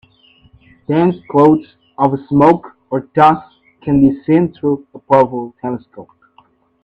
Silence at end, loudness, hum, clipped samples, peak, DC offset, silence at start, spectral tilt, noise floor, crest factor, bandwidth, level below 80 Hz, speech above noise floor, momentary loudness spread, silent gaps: 0.8 s; -14 LUFS; none; under 0.1%; 0 dBFS; under 0.1%; 0.9 s; -9.5 dB/octave; -52 dBFS; 16 dB; 5.6 kHz; -48 dBFS; 39 dB; 13 LU; none